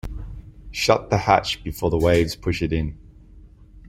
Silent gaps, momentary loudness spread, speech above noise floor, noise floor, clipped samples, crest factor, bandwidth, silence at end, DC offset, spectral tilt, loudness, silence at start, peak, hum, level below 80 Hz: none; 17 LU; 26 dB; -46 dBFS; under 0.1%; 22 dB; 16 kHz; 0 s; under 0.1%; -5.5 dB/octave; -21 LUFS; 0.05 s; -2 dBFS; none; -36 dBFS